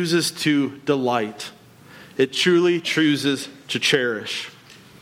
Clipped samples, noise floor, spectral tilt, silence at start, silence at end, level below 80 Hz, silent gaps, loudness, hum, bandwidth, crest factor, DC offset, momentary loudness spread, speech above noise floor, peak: under 0.1%; -46 dBFS; -4 dB/octave; 0 s; 0.3 s; -68 dBFS; none; -21 LUFS; none; 16 kHz; 16 dB; under 0.1%; 13 LU; 25 dB; -6 dBFS